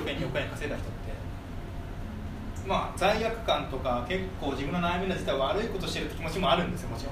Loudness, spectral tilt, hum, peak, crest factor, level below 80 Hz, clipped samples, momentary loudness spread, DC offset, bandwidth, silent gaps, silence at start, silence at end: -31 LUFS; -5.5 dB/octave; none; -12 dBFS; 18 dB; -40 dBFS; under 0.1%; 13 LU; under 0.1%; 15.5 kHz; none; 0 s; 0 s